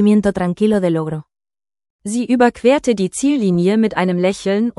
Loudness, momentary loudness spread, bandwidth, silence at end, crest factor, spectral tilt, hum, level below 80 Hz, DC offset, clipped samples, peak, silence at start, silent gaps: -16 LUFS; 9 LU; 12 kHz; 0.05 s; 14 dB; -6 dB/octave; none; -50 dBFS; under 0.1%; under 0.1%; -2 dBFS; 0 s; 1.90-1.99 s